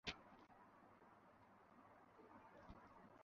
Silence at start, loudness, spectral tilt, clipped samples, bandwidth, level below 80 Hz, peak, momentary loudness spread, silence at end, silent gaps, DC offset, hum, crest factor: 0.05 s; -64 LUFS; -2 dB/octave; under 0.1%; 6.4 kHz; -76 dBFS; -30 dBFS; 7 LU; 0 s; none; under 0.1%; none; 32 dB